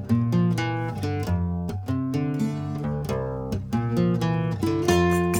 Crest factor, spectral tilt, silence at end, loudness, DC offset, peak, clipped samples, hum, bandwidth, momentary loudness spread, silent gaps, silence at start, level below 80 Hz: 18 dB; -7 dB/octave; 0 s; -25 LUFS; under 0.1%; -6 dBFS; under 0.1%; none; 18.5 kHz; 8 LU; none; 0 s; -44 dBFS